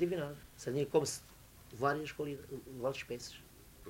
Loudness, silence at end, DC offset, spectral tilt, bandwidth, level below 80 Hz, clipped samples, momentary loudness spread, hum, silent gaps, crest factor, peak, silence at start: -38 LUFS; 0 s; under 0.1%; -5 dB/octave; 16 kHz; -64 dBFS; under 0.1%; 21 LU; none; none; 22 dB; -16 dBFS; 0 s